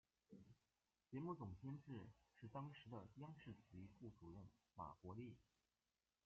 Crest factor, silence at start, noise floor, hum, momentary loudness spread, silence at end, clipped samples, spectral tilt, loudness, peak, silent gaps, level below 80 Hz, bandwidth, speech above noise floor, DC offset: 20 dB; 0.3 s; under -90 dBFS; none; 11 LU; 0.85 s; under 0.1%; -7.5 dB/octave; -58 LUFS; -38 dBFS; none; -80 dBFS; 7 kHz; over 33 dB; under 0.1%